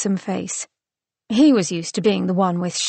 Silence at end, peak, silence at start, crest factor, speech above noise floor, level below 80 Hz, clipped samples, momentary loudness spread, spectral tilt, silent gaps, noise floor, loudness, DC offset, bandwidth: 0 s; -6 dBFS; 0 s; 14 dB; 70 dB; -64 dBFS; under 0.1%; 12 LU; -5 dB/octave; none; -89 dBFS; -20 LUFS; under 0.1%; 8.8 kHz